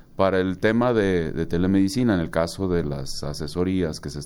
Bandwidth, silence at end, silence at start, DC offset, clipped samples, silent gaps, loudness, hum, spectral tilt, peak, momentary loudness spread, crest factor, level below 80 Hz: 16.5 kHz; 0 s; 0.15 s; under 0.1%; under 0.1%; none; -23 LUFS; none; -6.5 dB/octave; -6 dBFS; 9 LU; 16 dB; -40 dBFS